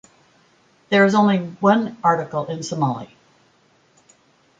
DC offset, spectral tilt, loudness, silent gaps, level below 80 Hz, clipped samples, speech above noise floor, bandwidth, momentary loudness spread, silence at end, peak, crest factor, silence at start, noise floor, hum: under 0.1%; -6 dB/octave; -19 LUFS; none; -66 dBFS; under 0.1%; 40 dB; 7.8 kHz; 11 LU; 1.55 s; -2 dBFS; 18 dB; 0.9 s; -58 dBFS; none